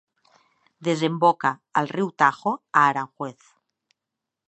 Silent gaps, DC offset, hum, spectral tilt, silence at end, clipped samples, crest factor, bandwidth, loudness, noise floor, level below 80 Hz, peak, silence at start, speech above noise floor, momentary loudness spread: none; under 0.1%; none; -5.5 dB/octave; 1.15 s; under 0.1%; 22 dB; 8.6 kHz; -22 LUFS; -85 dBFS; -78 dBFS; -2 dBFS; 0.8 s; 63 dB; 12 LU